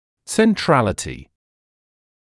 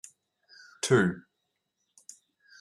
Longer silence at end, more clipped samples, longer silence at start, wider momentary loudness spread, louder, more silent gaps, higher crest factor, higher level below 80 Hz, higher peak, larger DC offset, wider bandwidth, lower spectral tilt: second, 1 s vs 1.4 s; neither; second, 0.3 s vs 0.85 s; second, 15 LU vs 27 LU; first, -18 LUFS vs -27 LUFS; neither; about the same, 18 dB vs 22 dB; first, -48 dBFS vs -76 dBFS; first, -2 dBFS vs -10 dBFS; neither; about the same, 12 kHz vs 13 kHz; about the same, -5 dB/octave vs -5 dB/octave